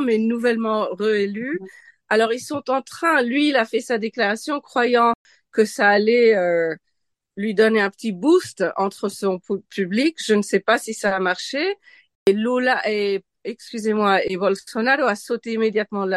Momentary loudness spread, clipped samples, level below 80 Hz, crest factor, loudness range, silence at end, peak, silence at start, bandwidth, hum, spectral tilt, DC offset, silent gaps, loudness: 10 LU; under 0.1%; -68 dBFS; 18 dB; 3 LU; 0 s; -2 dBFS; 0 s; 12.5 kHz; none; -4.5 dB/octave; under 0.1%; 5.15-5.25 s, 12.15-12.26 s; -20 LUFS